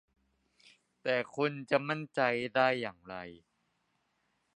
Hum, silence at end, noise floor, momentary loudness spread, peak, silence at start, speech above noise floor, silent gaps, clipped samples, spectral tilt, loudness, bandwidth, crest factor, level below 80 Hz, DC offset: none; 1.2 s; -78 dBFS; 16 LU; -12 dBFS; 1.05 s; 45 dB; none; under 0.1%; -6 dB/octave; -32 LUFS; 10.5 kHz; 24 dB; -76 dBFS; under 0.1%